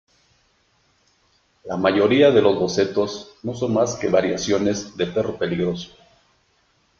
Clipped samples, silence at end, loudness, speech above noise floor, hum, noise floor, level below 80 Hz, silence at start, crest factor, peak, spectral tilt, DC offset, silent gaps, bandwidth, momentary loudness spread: under 0.1%; 1.15 s; -20 LUFS; 43 dB; none; -63 dBFS; -56 dBFS; 1.65 s; 20 dB; -2 dBFS; -5 dB/octave; under 0.1%; none; 7.4 kHz; 16 LU